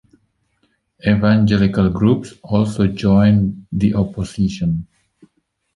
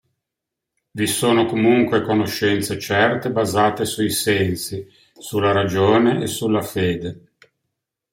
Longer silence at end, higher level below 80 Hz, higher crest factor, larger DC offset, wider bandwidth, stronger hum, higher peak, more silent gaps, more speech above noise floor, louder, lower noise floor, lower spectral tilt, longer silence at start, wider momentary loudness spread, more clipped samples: about the same, 0.95 s vs 0.95 s; first, -38 dBFS vs -56 dBFS; about the same, 16 dB vs 18 dB; neither; second, 11 kHz vs 16.5 kHz; neither; about the same, -2 dBFS vs -2 dBFS; neither; second, 50 dB vs 64 dB; about the same, -17 LUFS vs -19 LUFS; second, -65 dBFS vs -83 dBFS; first, -8 dB/octave vs -5 dB/octave; about the same, 1.05 s vs 0.95 s; about the same, 8 LU vs 10 LU; neither